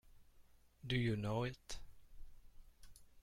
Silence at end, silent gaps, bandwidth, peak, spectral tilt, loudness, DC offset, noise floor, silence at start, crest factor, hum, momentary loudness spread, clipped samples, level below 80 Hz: 0 s; none; 15 kHz; -26 dBFS; -6 dB/octave; -42 LUFS; under 0.1%; -66 dBFS; 0.05 s; 20 dB; none; 16 LU; under 0.1%; -58 dBFS